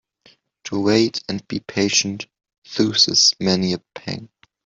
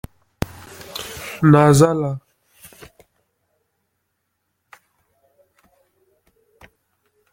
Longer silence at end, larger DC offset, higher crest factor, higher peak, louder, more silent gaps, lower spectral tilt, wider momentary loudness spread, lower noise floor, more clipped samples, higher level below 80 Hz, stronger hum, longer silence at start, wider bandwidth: second, 0.4 s vs 5.15 s; neither; about the same, 20 dB vs 22 dB; about the same, -2 dBFS vs -2 dBFS; about the same, -18 LUFS vs -17 LUFS; first, 2.58-2.62 s vs none; second, -3 dB/octave vs -6.5 dB/octave; second, 17 LU vs 21 LU; second, -56 dBFS vs -74 dBFS; neither; second, -58 dBFS vs -48 dBFS; neither; first, 0.65 s vs 0.4 s; second, 7.8 kHz vs 17 kHz